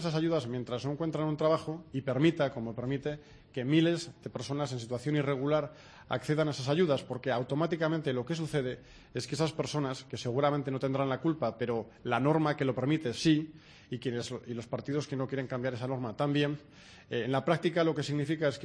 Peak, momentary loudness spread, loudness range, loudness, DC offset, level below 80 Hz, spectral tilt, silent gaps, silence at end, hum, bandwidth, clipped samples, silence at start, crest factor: -12 dBFS; 10 LU; 3 LU; -32 LUFS; under 0.1%; -64 dBFS; -6.5 dB/octave; none; 0 s; none; 11 kHz; under 0.1%; 0 s; 20 dB